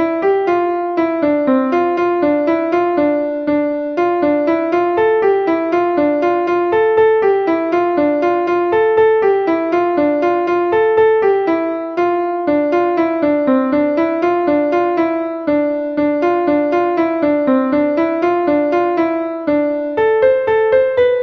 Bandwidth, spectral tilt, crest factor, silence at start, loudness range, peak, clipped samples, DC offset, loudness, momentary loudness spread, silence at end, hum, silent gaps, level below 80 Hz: 6.2 kHz; -7.5 dB/octave; 12 dB; 0 s; 2 LU; -2 dBFS; under 0.1%; under 0.1%; -15 LUFS; 5 LU; 0 s; none; none; -52 dBFS